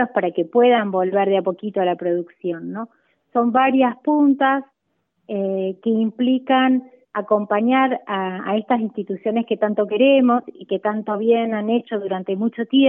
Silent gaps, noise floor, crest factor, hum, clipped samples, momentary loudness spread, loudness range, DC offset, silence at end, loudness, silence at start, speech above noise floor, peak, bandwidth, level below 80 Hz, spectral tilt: none; -72 dBFS; 14 dB; none; under 0.1%; 10 LU; 1 LU; under 0.1%; 0 s; -20 LUFS; 0 s; 53 dB; -4 dBFS; 3.7 kHz; -74 dBFS; -10 dB/octave